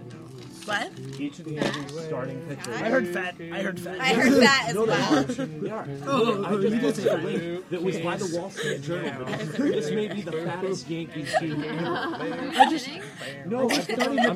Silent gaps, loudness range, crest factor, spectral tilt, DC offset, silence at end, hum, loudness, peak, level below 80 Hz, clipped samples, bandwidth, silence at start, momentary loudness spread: none; 7 LU; 22 dB; -4.5 dB/octave; under 0.1%; 0 s; none; -26 LUFS; -4 dBFS; -64 dBFS; under 0.1%; 15.5 kHz; 0 s; 12 LU